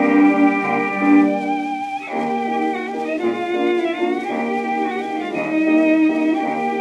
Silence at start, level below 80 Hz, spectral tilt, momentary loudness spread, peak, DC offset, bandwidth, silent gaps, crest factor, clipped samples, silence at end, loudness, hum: 0 s; -66 dBFS; -6.5 dB/octave; 9 LU; -4 dBFS; under 0.1%; 8.8 kHz; none; 14 dB; under 0.1%; 0 s; -19 LUFS; none